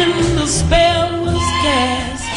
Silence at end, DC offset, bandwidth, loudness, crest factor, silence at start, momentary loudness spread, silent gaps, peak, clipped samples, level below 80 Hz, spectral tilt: 0 s; under 0.1%; 11.5 kHz; -15 LUFS; 14 dB; 0 s; 5 LU; none; -2 dBFS; under 0.1%; -26 dBFS; -4 dB/octave